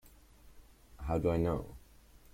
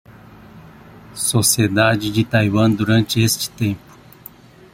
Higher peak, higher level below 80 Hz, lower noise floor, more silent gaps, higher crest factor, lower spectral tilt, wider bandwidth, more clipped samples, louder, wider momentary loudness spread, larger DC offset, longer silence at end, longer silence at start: second, -18 dBFS vs -2 dBFS; about the same, -50 dBFS vs -50 dBFS; first, -59 dBFS vs -43 dBFS; neither; about the same, 18 dB vs 18 dB; first, -8.5 dB/octave vs -4.5 dB/octave; about the same, 16.5 kHz vs 16.5 kHz; neither; second, -35 LUFS vs -17 LUFS; first, 20 LU vs 9 LU; neither; second, 0.55 s vs 0.95 s; about the same, 0.05 s vs 0.1 s